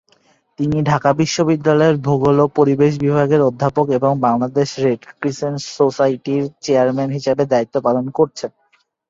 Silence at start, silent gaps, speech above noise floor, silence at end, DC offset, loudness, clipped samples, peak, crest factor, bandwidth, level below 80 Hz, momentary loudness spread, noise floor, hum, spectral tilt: 0.6 s; none; 45 dB; 0.6 s; under 0.1%; -17 LUFS; under 0.1%; 0 dBFS; 16 dB; 7.8 kHz; -52 dBFS; 7 LU; -61 dBFS; none; -6.5 dB/octave